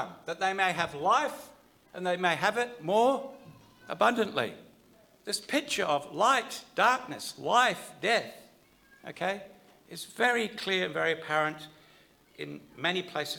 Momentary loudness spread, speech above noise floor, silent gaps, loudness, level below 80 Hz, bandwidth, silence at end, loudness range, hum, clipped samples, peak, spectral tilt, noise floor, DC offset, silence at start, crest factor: 17 LU; 31 dB; none; -29 LUFS; -74 dBFS; 19 kHz; 0 s; 3 LU; none; under 0.1%; -10 dBFS; -3 dB/octave; -61 dBFS; under 0.1%; 0 s; 20 dB